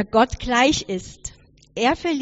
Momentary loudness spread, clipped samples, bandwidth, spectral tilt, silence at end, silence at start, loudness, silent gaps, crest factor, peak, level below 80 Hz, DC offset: 18 LU; under 0.1%; 8 kHz; -2.5 dB/octave; 0 s; 0 s; -20 LUFS; none; 18 dB; -4 dBFS; -40 dBFS; under 0.1%